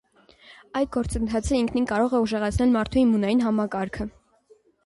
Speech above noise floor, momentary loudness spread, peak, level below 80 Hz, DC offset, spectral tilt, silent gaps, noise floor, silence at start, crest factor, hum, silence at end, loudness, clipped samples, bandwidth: 36 dB; 9 LU; -10 dBFS; -40 dBFS; under 0.1%; -6 dB/octave; none; -59 dBFS; 0.5 s; 14 dB; none; 0.75 s; -24 LUFS; under 0.1%; 11.5 kHz